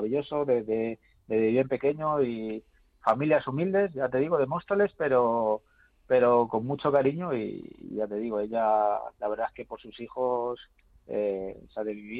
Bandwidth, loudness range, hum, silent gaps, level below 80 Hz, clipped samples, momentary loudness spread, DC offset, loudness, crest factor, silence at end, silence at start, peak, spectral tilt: 4.9 kHz; 4 LU; none; none; -62 dBFS; under 0.1%; 13 LU; under 0.1%; -28 LUFS; 16 dB; 0 s; 0 s; -10 dBFS; -9.5 dB/octave